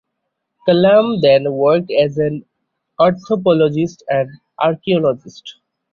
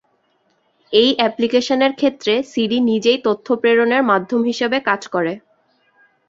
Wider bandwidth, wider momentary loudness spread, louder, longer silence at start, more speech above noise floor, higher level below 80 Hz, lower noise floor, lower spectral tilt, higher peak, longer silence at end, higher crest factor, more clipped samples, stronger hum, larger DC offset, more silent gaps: second, 7 kHz vs 7.8 kHz; first, 11 LU vs 5 LU; about the same, -15 LUFS vs -17 LUFS; second, 0.65 s vs 0.9 s; first, 60 dB vs 46 dB; first, -56 dBFS vs -62 dBFS; first, -75 dBFS vs -63 dBFS; first, -7.5 dB/octave vs -4.5 dB/octave; about the same, -2 dBFS vs 0 dBFS; second, 0.4 s vs 0.9 s; about the same, 14 dB vs 18 dB; neither; neither; neither; neither